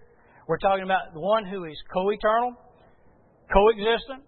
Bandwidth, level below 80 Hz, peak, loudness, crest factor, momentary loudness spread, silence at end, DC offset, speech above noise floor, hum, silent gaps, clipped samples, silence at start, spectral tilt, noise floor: 4.4 kHz; -44 dBFS; -4 dBFS; -24 LUFS; 20 dB; 11 LU; 0.1 s; under 0.1%; 33 dB; none; none; under 0.1%; 0.5 s; -9.5 dB/octave; -57 dBFS